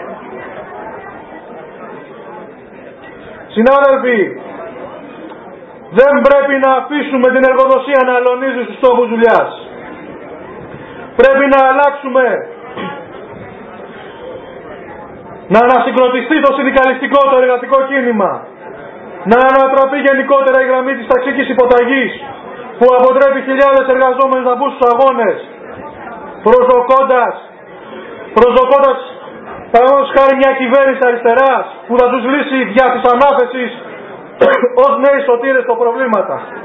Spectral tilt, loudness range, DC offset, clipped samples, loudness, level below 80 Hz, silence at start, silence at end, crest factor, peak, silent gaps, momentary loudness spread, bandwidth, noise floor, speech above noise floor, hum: -7 dB/octave; 5 LU; under 0.1%; 0.3%; -10 LUFS; -48 dBFS; 0 s; 0 s; 12 dB; 0 dBFS; none; 22 LU; 4.7 kHz; -34 dBFS; 24 dB; none